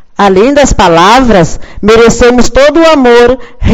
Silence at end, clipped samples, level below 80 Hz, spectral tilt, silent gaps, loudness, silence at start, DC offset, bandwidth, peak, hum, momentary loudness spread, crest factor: 0 s; 9%; -18 dBFS; -4.5 dB/octave; none; -5 LUFS; 0.2 s; under 0.1%; 13.5 kHz; 0 dBFS; none; 5 LU; 4 dB